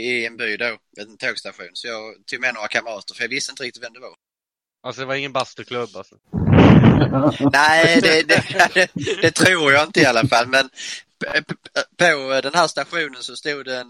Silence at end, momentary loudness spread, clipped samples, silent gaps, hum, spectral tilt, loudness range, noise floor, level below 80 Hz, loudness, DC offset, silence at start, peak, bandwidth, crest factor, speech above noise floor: 0.05 s; 18 LU; under 0.1%; none; none; -5 dB/octave; 12 LU; -90 dBFS; -42 dBFS; -17 LUFS; under 0.1%; 0 s; 0 dBFS; 15.5 kHz; 18 dB; 71 dB